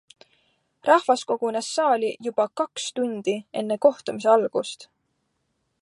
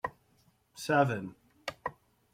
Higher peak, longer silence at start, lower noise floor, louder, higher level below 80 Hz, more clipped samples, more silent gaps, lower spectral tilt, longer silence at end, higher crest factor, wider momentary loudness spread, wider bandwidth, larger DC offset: first, -4 dBFS vs -12 dBFS; first, 0.85 s vs 0.05 s; first, -74 dBFS vs -69 dBFS; first, -23 LUFS vs -33 LUFS; second, -78 dBFS vs -68 dBFS; neither; neither; second, -3.5 dB/octave vs -5.5 dB/octave; first, 1 s vs 0.4 s; about the same, 20 dB vs 22 dB; second, 9 LU vs 17 LU; second, 11.5 kHz vs 16 kHz; neither